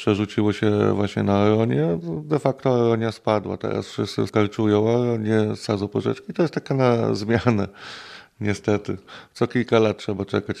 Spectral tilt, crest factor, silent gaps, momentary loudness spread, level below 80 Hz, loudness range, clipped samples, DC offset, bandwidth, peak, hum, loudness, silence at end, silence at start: -7 dB/octave; 18 dB; none; 8 LU; -60 dBFS; 3 LU; under 0.1%; under 0.1%; 11 kHz; -2 dBFS; none; -22 LUFS; 0 s; 0 s